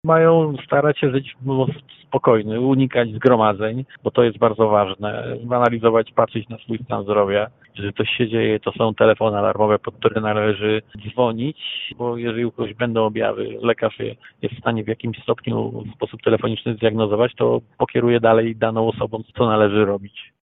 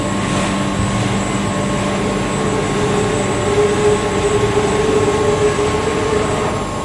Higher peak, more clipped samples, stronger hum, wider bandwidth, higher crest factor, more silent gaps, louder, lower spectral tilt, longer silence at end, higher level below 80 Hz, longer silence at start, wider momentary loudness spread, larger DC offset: about the same, 0 dBFS vs -2 dBFS; neither; neither; second, 4 kHz vs 11.5 kHz; about the same, 18 dB vs 14 dB; neither; second, -20 LUFS vs -16 LUFS; first, -9.5 dB/octave vs -5 dB/octave; first, 0.25 s vs 0 s; second, -54 dBFS vs -32 dBFS; about the same, 0.05 s vs 0 s; first, 11 LU vs 3 LU; neither